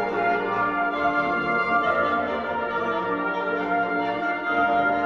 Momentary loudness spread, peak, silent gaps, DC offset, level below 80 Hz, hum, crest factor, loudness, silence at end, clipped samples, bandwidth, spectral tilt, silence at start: 4 LU; -10 dBFS; none; under 0.1%; -56 dBFS; none; 14 dB; -23 LUFS; 0 s; under 0.1%; 7 kHz; -6.5 dB/octave; 0 s